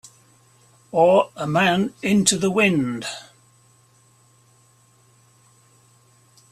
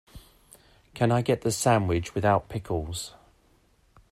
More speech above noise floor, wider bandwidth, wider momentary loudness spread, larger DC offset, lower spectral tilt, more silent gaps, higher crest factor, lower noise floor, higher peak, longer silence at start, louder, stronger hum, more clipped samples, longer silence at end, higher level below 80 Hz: about the same, 38 dB vs 38 dB; second, 14 kHz vs 16 kHz; about the same, 12 LU vs 12 LU; neither; second, -4 dB/octave vs -5.5 dB/octave; neither; about the same, 22 dB vs 20 dB; second, -57 dBFS vs -63 dBFS; first, -2 dBFS vs -8 dBFS; first, 0.95 s vs 0.15 s; first, -19 LUFS vs -26 LUFS; neither; neither; first, 3.3 s vs 1 s; second, -62 dBFS vs -50 dBFS